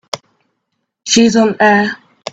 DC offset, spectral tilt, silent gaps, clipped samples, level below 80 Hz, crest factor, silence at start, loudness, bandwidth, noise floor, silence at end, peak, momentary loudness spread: under 0.1%; -3.5 dB/octave; none; under 0.1%; -56 dBFS; 14 dB; 0.15 s; -11 LUFS; 9 kHz; -71 dBFS; 0 s; 0 dBFS; 17 LU